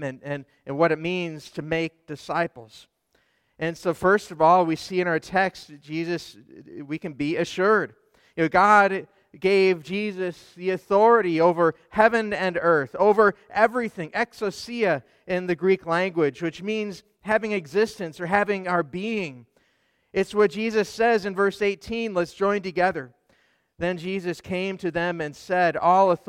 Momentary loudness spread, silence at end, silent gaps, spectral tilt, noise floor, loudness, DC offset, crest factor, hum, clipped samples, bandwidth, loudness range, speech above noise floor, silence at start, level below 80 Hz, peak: 14 LU; 0.1 s; none; -6 dB/octave; -68 dBFS; -23 LUFS; under 0.1%; 20 dB; none; under 0.1%; 14.5 kHz; 6 LU; 44 dB; 0 s; -60 dBFS; -4 dBFS